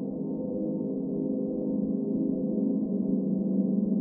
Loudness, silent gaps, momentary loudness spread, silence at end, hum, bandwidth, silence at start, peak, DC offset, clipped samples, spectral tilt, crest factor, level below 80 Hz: -29 LUFS; none; 5 LU; 0 s; none; 1.2 kHz; 0 s; -16 dBFS; under 0.1%; under 0.1%; -16.5 dB/octave; 12 dB; -62 dBFS